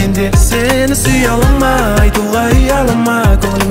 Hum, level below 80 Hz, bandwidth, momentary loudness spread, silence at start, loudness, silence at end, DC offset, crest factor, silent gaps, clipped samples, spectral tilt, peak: none; -14 dBFS; 16.5 kHz; 1 LU; 0 s; -11 LUFS; 0 s; under 0.1%; 10 dB; none; under 0.1%; -5 dB/octave; 0 dBFS